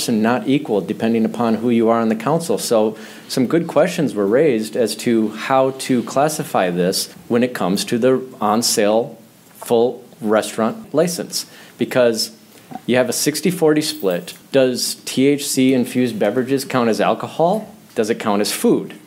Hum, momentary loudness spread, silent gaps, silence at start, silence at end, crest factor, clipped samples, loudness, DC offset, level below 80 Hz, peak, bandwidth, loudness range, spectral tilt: none; 6 LU; none; 0 s; 0.1 s; 16 dB; under 0.1%; -18 LUFS; under 0.1%; -68 dBFS; -2 dBFS; 16.5 kHz; 2 LU; -4.5 dB/octave